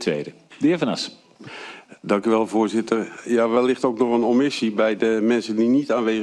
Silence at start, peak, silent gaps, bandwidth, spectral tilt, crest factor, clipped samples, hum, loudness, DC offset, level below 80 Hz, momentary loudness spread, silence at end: 0 s; -6 dBFS; none; 11 kHz; -5.5 dB/octave; 16 dB; under 0.1%; none; -21 LUFS; under 0.1%; -68 dBFS; 17 LU; 0 s